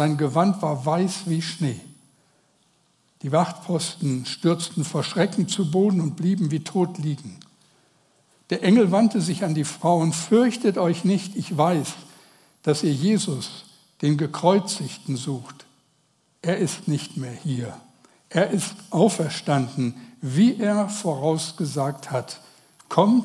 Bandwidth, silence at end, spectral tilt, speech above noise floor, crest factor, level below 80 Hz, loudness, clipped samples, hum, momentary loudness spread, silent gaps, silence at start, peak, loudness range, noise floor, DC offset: 12 kHz; 0 s; -6 dB/octave; 43 dB; 22 dB; -74 dBFS; -23 LUFS; under 0.1%; none; 11 LU; none; 0 s; -2 dBFS; 6 LU; -65 dBFS; under 0.1%